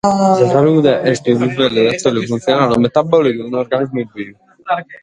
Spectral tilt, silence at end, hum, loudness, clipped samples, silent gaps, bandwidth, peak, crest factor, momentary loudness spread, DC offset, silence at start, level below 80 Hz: -6 dB/octave; 0.05 s; none; -14 LUFS; under 0.1%; none; 10.5 kHz; 0 dBFS; 14 dB; 10 LU; under 0.1%; 0.05 s; -52 dBFS